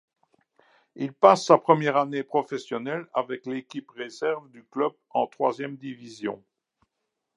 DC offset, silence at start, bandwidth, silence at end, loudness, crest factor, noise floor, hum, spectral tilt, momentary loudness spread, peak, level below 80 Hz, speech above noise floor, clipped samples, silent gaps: under 0.1%; 0.95 s; 11 kHz; 1 s; -25 LUFS; 24 dB; -82 dBFS; none; -5.5 dB/octave; 18 LU; -2 dBFS; -82 dBFS; 56 dB; under 0.1%; none